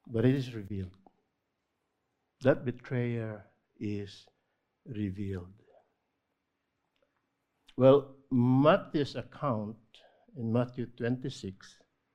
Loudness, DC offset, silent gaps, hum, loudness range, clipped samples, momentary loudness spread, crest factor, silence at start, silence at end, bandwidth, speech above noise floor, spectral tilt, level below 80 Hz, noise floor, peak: -31 LUFS; under 0.1%; none; none; 14 LU; under 0.1%; 19 LU; 24 dB; 0.1 s; 0.5 s; 9 kHz; 52 dB; -8 dB/octave; -64 dBFS; -82 dBFS; -8 dBFS